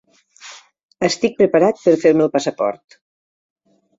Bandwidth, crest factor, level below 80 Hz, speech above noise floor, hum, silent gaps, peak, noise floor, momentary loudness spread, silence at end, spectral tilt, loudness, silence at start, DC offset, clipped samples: 7.8 kHz; 18 dB; -60 dBFS; 27 dB; none; 0.83-0.89 s; -2 dBFS; -42 dBFS; 24 LU; 1.25 s; -5 dB/octave; -16 LUFS; 0.45 s; under 0.1%; under 0.1%